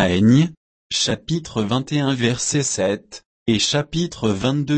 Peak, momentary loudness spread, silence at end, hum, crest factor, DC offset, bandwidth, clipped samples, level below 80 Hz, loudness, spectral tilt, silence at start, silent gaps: -4 dBFS; 9 LU; 0 s; none; 16 dB; under 0.1%; 8.8 kHz; under 0.1%; -48 dBFS; -20 LUFS; -4.5 dB/octave; 0 s; 0.57-0.90 s, 3.26-3.46 s